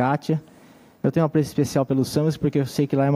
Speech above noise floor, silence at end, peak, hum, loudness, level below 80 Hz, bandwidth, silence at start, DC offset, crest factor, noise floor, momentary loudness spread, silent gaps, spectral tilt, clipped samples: 29 dB; 0 s; -6 dBFS; none; -23 LUFS; -54 dBFS; 16 kHz; 0 s; under 0.1%; 16 dB; -50 dBFS; 5 LU; none; -7 dB/octave; under 0.1%